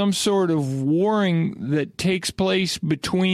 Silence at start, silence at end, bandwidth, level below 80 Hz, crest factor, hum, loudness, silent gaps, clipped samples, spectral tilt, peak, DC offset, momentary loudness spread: 0 s; 0 s; 14.5 kHz; -54 dBFS; 10 dB; none; -22 LUFS; none; under 0.1%; -5.5 dB/octave; -10 dBFS; under 0.1%; 4 LU